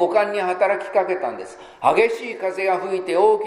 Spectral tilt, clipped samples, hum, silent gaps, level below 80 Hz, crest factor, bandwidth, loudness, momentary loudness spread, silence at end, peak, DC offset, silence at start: -5 dB/octave; under 0.1%; none; none; -66 dBFS; 18 dB; 12 kHz; -21 LUFS; 9 LU; 0 s; -2 dBFS; under 0.1%; 0 s